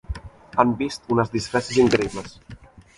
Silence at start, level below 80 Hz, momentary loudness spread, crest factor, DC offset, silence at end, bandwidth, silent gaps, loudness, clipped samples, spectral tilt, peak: 0.1 s; -44 dBFS; 18 LU; 22 dB; under 0.1%; 0.4 s; 11.5 kHz; none; -22 LUFS; under 0.1%; -5.5 dB/octave; -2 dBFS